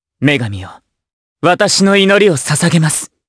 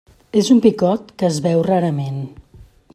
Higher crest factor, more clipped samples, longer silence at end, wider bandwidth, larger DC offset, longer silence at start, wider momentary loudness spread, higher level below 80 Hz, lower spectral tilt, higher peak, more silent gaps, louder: about the same, 14 dB vs 16 dB; neither; about the same, 0.2 s vs 0.3 s; second, 11 kHz vs 13 kHz; neither; second, 0.2 s vs 0.35 s; second, 8 LU vs 13 LU; about the same, -52 dBFS vs -52 dBFS; second, -4 dB/octave vs -6.5 dB/octave; about the same, 0 dBFS vs -2 dBFS; first, 1.13-1.36 s vs none; first, -11 LUFS vs -17 LUFS